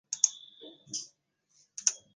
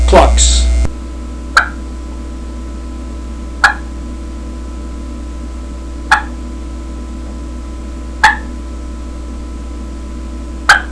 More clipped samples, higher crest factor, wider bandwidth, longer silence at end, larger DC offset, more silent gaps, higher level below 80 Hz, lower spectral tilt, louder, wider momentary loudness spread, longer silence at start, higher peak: second, under 0.1% vs 0.3%; first, 32 dB vs 16 dB; about the same, 10 kHz vs 11 kHz; first, 0.2 s vs 0 s; neither; neither; second, under -90 dBFS vs -20 dBFS; second, 2 dB/octave vs -3.5 dB/octave; second, -31 LUFS vs -17 LUFS; first, 22 LU vs 16 LU; about the same, 0.1 s vs 0 s; second, -6 dBFS vs 0 dBFS